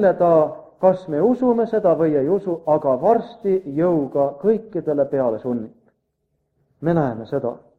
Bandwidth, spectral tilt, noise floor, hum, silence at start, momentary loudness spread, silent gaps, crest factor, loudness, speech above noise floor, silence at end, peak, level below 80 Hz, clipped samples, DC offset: 6.2 kHz; -10 dB/octave; -72 dBFS; none; 0 s; 8 LU; none; 16 dB; -20 LUFS; 53 dB; 0.2 s; -2 dBFS; -60 dBFS; under 0.1%; under 0.1%